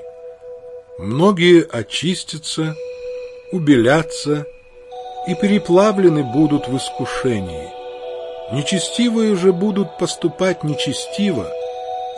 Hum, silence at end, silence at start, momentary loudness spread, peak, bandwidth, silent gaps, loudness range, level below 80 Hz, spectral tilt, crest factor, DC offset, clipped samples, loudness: none; 0 s; 0 s; 18 LU; 0 dBFS; 11.5 kHz; none; 3 LU; -50 dBFS; -5.5 dB/octave; 18 dB; under 0.1%; under 0.1%; -17 LUFS